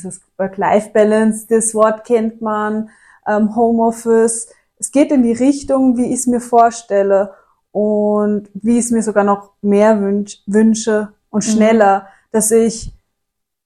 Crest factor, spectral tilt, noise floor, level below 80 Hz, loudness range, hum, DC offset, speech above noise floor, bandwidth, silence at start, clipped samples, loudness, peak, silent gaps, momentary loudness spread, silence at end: 14 dB; -5 dB/octave; -77 dBFS; -48 dBFS; 2 LU; none; under 0.1%; 63 dB; 15 kHz; 0 s; under 0.1%; -15 LUFS; 0 dBFS; none; 9 LU; 0.75 s